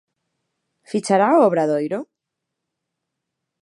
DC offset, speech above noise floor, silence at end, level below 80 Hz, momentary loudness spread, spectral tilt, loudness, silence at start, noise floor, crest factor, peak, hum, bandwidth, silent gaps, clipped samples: under 0.1%; 64 dB; 1.6 s; -80 dBFS; 12 LU; -6 dB/octave; -18 LUFS; 0.9 s; -81 dBFS; 20 dB; -4 dBFS; none; 11.5 kHz; none; under 0.1%